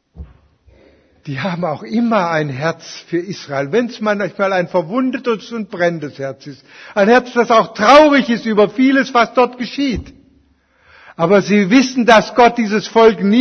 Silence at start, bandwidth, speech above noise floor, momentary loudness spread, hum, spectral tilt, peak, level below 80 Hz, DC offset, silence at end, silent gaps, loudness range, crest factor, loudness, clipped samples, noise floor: 0.15 s; 7.2 kHz; 41 dB; 13 LU; none; -5.5 dB/octave; 0 dBFS; -46 dBFS; under 0.1%; 0 s; none; 7 LU; 14 dB; -14 LUFS; under 0.1%; -55 dBFS